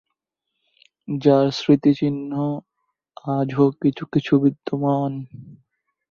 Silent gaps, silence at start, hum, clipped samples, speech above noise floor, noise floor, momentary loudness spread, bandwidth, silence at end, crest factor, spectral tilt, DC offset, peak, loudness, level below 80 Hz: none; 1.1 s; none; under 0.1%; 60 dB; -80 dBFS; 13 LU; 7 kHz; 0.55 s; 20 dB; -8 dB/octave; under 0.1%; -2 dBFS; -20 LUFS; -62 dBFS